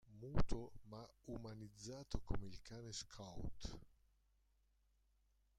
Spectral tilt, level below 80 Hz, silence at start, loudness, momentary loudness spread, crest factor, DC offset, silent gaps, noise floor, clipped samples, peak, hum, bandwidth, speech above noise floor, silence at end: -5.5 dB/octave; -54 dBFS; 0.05 s; -51 LUFS; 12 LU; 24 dB; under 0.1%; none; -79 dBFS; under 0.1%; -22 dBFS; 50 Hz at -70 dBFS; 9.8 kHz; 35 dB; 1.7 s